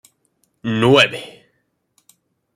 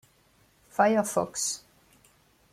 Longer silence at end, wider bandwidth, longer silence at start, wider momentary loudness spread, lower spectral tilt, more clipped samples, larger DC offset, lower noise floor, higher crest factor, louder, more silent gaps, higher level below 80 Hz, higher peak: first, 1.25 s vs 0.95 s; about the same, 15 kHz vs 16 kHz; about the same, 0.65 s vs 0.75 s; first, 20 LU vs 13 LU; first, -5 dB/octave vs -3.5 dB/octave; neither; neither; first, -68 dBFS vs -64 dBFS; about the same, 20 dB vs 22 dB; first, -15 LUFS vs -27 LUFS; neither; first, -60 dBFS vs -68 dBFS; first, 0 dBFS vs -10 dBFS